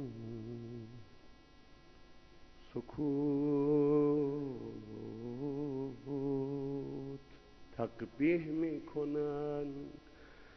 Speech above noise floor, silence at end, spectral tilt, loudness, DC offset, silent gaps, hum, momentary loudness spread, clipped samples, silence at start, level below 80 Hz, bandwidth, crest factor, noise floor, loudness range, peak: 24 dB; 0 s; -8 dB/octave; -37 LUFS; under 0.1%; none; none; 17 LU; under 0.1%; 0 s; -64 dBFS; 6.2 kHz; 16 dB; -59 dBFS; 7 LU; -22 dBFS